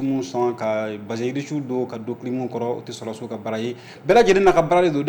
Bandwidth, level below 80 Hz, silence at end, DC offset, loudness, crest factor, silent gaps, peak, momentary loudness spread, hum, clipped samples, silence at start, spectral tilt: 19 kHz; -48 dBFS; 0 s; under 0.1%; -22 LUFS; 16 dB; none; -6 dBFS; 15 LU; none; under 0.1%; 0 s; -6 dB/octave